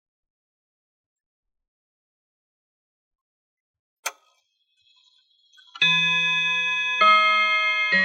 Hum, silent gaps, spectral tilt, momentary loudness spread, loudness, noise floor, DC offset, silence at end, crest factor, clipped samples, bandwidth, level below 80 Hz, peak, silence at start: none; none; -1.5 dB/octave; 18 LU; -18 LUFS; -69 dBFS; under 0.1%; 0 s; 20 dB; under 0.1%; 14 kHz; under -90 dBFS; -6 dBFS; 4.05 s